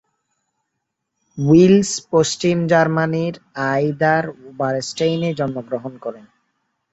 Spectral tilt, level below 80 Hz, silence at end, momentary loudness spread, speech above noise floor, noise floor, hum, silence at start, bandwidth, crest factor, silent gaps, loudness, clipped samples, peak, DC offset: -5.5 dB/octave; -56 dBFS; 0.75 s; 15 LU; 59 dB; -77 dBFS; none; 1.35 s; 8.2 kHz; 18 dB; none; -18 LUFS; under 0.1%; -2 dBFS; under 0.1%